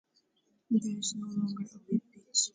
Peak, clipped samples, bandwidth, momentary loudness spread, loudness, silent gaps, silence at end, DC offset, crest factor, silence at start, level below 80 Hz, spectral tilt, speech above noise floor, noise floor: -14 dBFS; under 0.1%; 9.6 kHz; 5 LU; -33 LUFS; none; 0.05 s; under 0.1%; 20 dB; 0.7 s; -78 dBFS; -4 dB/octave; 42 dB; -74 dBFS